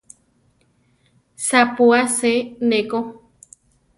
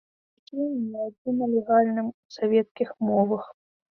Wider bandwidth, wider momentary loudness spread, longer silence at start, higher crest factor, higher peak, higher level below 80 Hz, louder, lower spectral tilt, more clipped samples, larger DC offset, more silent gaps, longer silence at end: first, 11.5 kHz vs 6.4 kHz; about the same, 11 LU vs 10 LU; first, 1.4 s vs 0.55 s; about the same, 18 dB vs 18 dB; first, -2 dBFS vs -8 dBFS; first, -64 dBFS vs -72 dBFS; first, -18 LUFS vs -26 LUFS; second, -2.5 dB/octave vs -8.5 dB/octave; neither; neither; second, none vs 1.18-1.25 s, 2.14-2.29 s, 2.71-2.75 s; first, 0.8 s vs 0.4 s